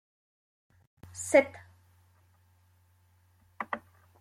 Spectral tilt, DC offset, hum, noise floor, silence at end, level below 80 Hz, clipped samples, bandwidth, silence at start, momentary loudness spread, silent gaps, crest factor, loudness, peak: -3.5 dB/octave; under 0.1%; none; -66 dBFS; 0.4 s; -76 dBFS; under 0.1%; 15.5 kHz; 1.15 s; 22 LU; none; 26 dB; -29 LUFS; -8 dBFS